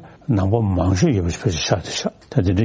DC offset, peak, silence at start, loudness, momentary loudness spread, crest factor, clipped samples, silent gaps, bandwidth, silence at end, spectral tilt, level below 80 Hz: under 0.1%; -2 dBFS; 0 s; -20 LUFS; 6 LU; 16 dB; under 0.1%; none; 8 kHz; 0 s; -6 dB/octave; -32 dBFS